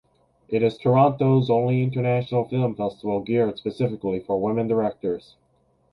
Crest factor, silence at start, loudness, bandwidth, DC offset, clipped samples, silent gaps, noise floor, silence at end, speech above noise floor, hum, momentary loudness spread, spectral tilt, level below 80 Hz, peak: 18 dB; 0.5 s; -23 LUFS; 5.4 kHz; under 0.1%; under 0.1%; none; -64 dBFS; 0.75 s; 42 dB; none; 10 LU; -10 dB/octave; -58 dBFS; -4 dBFS